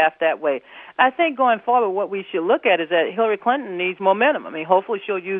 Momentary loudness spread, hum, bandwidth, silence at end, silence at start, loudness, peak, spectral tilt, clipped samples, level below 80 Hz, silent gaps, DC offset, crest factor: 7 LU; none; 3.9 kHz; 0 s; 0 s; -20 LUFS; -2 dBFS; -8 dB/octave; under 0.1%; -78 dBFS; none; under 0.1%; 18 dB